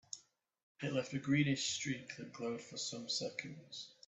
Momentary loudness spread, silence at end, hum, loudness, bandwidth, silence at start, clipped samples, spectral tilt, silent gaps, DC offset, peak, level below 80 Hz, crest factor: 15 LU; 0.15 s; none; -39 LUFS; 8.2 kHz; 0.15 s; under 0.1%; -4 dB/octave; 0.63-0.75 s; under 0.1%; -20 dBFS; -78 dBFS; 20 dB